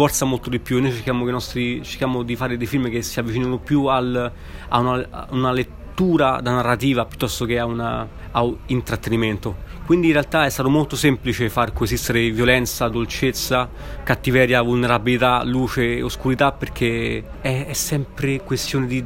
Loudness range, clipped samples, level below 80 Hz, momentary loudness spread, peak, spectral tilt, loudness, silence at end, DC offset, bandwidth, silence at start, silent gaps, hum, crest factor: 3 LU; under 0.1%; -36 dBFS; 8 LU; 0 dBFS; -5 dB/octave; -20 LUFS; 0 s; under 0.1%; 16.5 kHz; 0 s; none; none; 20 dB